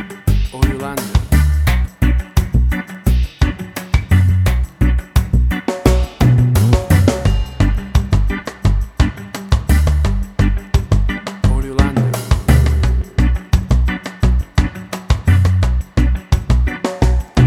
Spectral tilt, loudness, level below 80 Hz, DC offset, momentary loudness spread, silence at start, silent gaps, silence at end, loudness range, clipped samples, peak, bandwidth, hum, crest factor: -6.5 dB/octave; -16 LUFS; -16 dBFS; under 0.1%; 6 LU; 0 s; none; 0 s; 2 LU; under 0.1%; 0 dBFS; 16 kHz; none; 14 dB